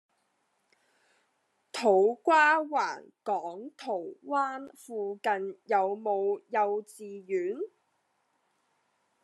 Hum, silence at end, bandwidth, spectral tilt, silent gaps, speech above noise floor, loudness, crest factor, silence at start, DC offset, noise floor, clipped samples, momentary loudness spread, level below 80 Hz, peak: none; 1.55 s; 12.5 kHz; -4 dB/octave; none; 46 dB; -29 LUFS; 20 dB; 1.75 s; under 0.1%; -75 dBFS; under 0.1%; 17 LU; under -90 dBFS; -10 dBFS